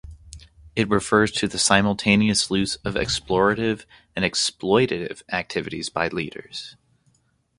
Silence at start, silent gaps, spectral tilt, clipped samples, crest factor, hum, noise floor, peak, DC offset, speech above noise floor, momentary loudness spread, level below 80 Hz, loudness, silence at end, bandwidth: 0.05 s; none; -3.5 dB/octave; under 0.1%; 22 dB; none; -65 dBFS; 0 dBFS; under 0.1%; 42 dB; 14 LU; -48 dBFS; -22 LUFS; 0.85 s; 11.5 kHz